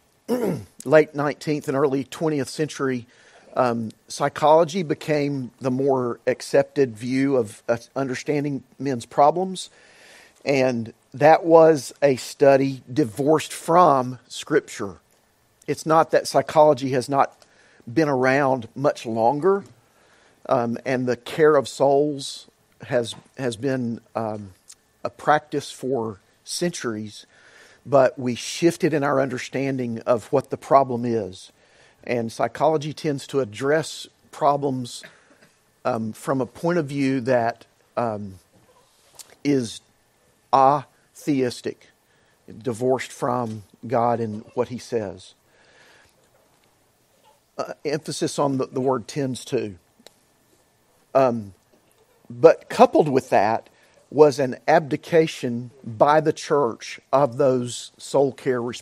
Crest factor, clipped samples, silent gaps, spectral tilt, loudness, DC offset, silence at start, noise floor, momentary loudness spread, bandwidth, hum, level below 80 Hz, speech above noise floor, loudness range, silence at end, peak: 22 dB; under 0.1%; none; -5.5 dB/octave; -22 LUFS; under 0.1%; 0.3 s; -62 dBFS; 15 LU; 15 kHz; none; -68 dBFS; 40 dB; 8 LU; 0 s; 0 dBFS